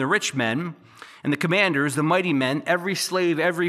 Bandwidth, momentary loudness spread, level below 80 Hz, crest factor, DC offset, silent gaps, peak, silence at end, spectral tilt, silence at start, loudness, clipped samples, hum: 15 kHz; 8 LU; -78 dBFS; 16 dB; under 0.1%; none; -6 dBFS; 0 s; -4.5 dB/octave; 0 s; -22 LUFS; under 0.1%; none